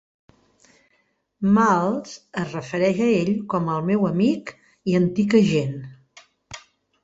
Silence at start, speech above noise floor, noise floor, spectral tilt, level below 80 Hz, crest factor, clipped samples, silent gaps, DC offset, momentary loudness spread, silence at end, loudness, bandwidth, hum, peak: 1.4 s; 47 dB; -67 dBFS; -7 dB/octave; -58 dBFS; 18 dB; under 0.1%; none; under 0.1%; 21 LU; 0.45 s; -21 LUFS; 7.8 kHz; none; -4 dBFS